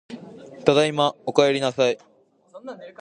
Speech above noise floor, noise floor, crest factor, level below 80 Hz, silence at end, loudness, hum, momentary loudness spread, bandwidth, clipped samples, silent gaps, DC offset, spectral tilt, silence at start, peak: 28 dB; -49 dBFS; 22 dB; -66 dBFS; 0.1 s; -21 LUFS; none; 21 LU; 10 kHz; under 0.1%; none; under 0.1%; -4.5 dB/octave; 0.1 s; -2 dBFS